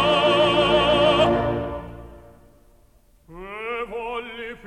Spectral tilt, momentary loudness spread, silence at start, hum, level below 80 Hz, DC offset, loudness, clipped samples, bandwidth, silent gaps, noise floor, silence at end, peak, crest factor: -5.5 dB/octave; 20 LU; 0 s; none; -42 dBFS; 0.1%; -20 LUFS; under 0.1%; 11.5 kHz; none; -56 dBFS; 0.1 s; -6 dBFS; 16 dB